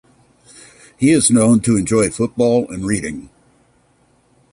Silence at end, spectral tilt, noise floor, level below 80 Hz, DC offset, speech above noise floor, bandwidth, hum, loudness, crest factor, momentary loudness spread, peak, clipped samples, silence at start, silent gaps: 1.25 s; -5 dB/octave; -57 dBFS; -46 dBFS; under 0.1%; 42 dB; 11.5 kHz; none; -15 LUFS; 16 dB; 10 LU; -2 dBFS; under 0.1%; 1 s; none